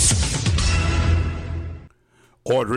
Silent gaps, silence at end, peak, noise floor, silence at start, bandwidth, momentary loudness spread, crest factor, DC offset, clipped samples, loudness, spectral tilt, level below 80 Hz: none; 0 s; -6 dBFS; -58 dBFS; 0 s; 14 kHz; 16 LU; 16 dB; under 0.1%; under 0.1%; -21 LUFS; -4 dB/octave; -26 dBFS